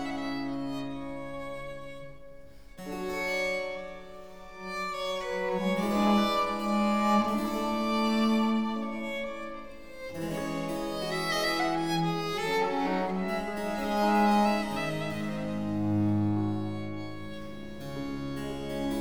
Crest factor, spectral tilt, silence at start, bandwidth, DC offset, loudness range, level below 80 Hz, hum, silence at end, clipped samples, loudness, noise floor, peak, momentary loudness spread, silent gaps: 16 dB; -5.5 dB/octave; 0 s; 19 kHz; 0.5%; 8 LU; -54 dBFS; none; 0 s; under 0.1%; -30 LUFS; -50 dBFS; -14 dBFS; 16 LU; none